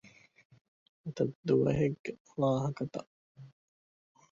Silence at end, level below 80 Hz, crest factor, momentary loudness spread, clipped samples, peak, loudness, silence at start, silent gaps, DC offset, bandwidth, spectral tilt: 0.85 s; -62 dBFS; 20 dB; 16 LU; under 0.1%; -16 dBFS; -32 LUFS; 0.05 s; 0.45-0.50 s, 0.61-1.04 s, 1.35-1.43 s, 1.99-2.04 s, 2.20-2.25 s, 3.07-3.35 s; under 0.1%; 7.4 kHz; -8 dB/octave